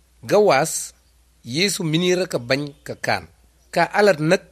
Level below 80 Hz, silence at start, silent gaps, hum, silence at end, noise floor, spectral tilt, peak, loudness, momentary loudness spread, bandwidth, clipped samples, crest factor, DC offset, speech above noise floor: -56 dBFS; 0.25 s; none; none; 0.15 s; -54 dBFS; -4 dB/octave; -2 dBFS; -20 LUFS; 11 LU; 14.5 kHz; under 0.1%; 20 dB; under 0.1%; 34 dB